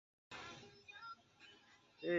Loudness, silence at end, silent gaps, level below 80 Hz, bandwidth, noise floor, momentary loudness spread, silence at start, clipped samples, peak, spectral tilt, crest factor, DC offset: -55 LUFS; 0 s; none; -82 dBFS; 7.6 kHz; -68 dBFS; 12 LU; 0.3 s; under 0.1%; -26 dBFS; -3.5 dB/octave; 22 dB; under 0.1%